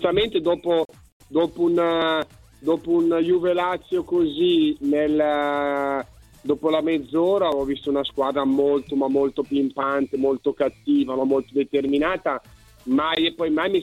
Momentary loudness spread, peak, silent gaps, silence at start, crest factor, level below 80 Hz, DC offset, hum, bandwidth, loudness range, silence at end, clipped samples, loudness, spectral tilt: 6 LU; -8 dBFS; 1.12-1.20 s; 0 s; 14 dB; -54 dBFS; under 0.1%; none; 12 kHz; 2 LU; 0 s; under 0.1%; -22 LUFS; -6.5 dB/octave